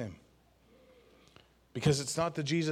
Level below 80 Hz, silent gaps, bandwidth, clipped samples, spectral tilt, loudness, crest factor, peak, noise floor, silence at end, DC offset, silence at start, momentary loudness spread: -62 dBFS; none; 15 kHz; under 0.1%; -5 dB/octave; -33 LUFS; 20 dB; -14 dBFS; -65 dBFS; 0 s; under 0.1%; 0 s; 14 LU